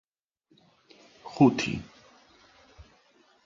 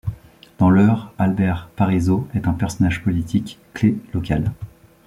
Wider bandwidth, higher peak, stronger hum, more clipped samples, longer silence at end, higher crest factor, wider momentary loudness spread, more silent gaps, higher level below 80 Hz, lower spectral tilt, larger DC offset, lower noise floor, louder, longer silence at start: second, 7.6 kHz vs 12.5 kHz; second, -8 dBFS vs -4 dBFS; neither; neither; first, 0.65 s vs 0.4 s; first, 24 dB vs 16 dB; first, 26 LU vs 11 LU; neither; second, -60 dBFS vs -40 dBFS; second, -6 dB/octave vs -8 dB/octave; neither; first, -70 dBFS vs -41 dBFS; second, -25 LUFS vs -20 LUFS; first, 1.25 s vs 0.05 s